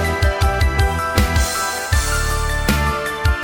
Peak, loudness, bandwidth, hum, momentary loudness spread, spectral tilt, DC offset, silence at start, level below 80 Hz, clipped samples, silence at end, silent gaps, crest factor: -2 dBFS; -18 LUFS; 17.5 kHz; none; 3 LU; -4 dB/octave; under 0.1%; 0 s; -20 dBFS; under 0.1%; 0 s; none; 16 dB